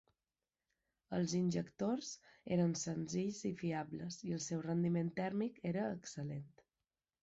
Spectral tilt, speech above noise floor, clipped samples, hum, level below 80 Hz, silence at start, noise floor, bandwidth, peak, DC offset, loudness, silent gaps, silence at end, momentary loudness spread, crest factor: -7 dB/octave; over 51 dB; under 0.1%; none; -74 dBFS; 1.1 s; under -90 dBFS; 8 kHz; -26 dBFS; under 0.1%; -40 LUFS; none; 0.75 s; 9 LU; 14 dB